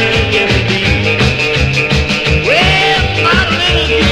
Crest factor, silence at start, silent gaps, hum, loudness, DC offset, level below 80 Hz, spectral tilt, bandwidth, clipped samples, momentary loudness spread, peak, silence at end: 12 dB; 0 s; none; none; -10 LUFS; under 0.1%; -22 dBFS; -4.5 dB/octave; 13 kHz; under 0.1%; 3 LU; 0 dBFS; 0 s